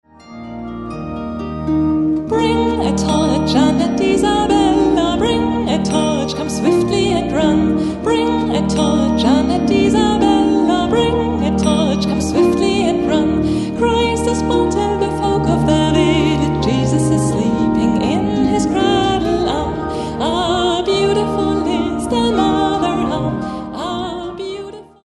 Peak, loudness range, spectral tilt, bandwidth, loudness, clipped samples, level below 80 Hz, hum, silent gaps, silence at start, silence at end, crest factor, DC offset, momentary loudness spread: -2 dBFS; 3 LU; -6 dB/octave; 11.5 kHz; -16 LUFS; under 0.1%; -32 dBFS; none; none; 0.25 s; 0.2 s; 14 dB; under 0.1%; 9 LU